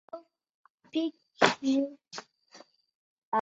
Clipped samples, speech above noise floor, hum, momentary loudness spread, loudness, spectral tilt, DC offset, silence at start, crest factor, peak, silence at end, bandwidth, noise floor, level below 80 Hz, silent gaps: under 0.1%; 28 dB; none; 20 LU; -30 LUFS; -3.5 dB/octave; under 0.1%; 0.15 s; 30 dB; -4 dBFS; 0 s; 8.2 kHz; -57 dBFS; -76 dBFS; 0.54-0.64 s, 0.70-0.78 s, 2.95-3.32 s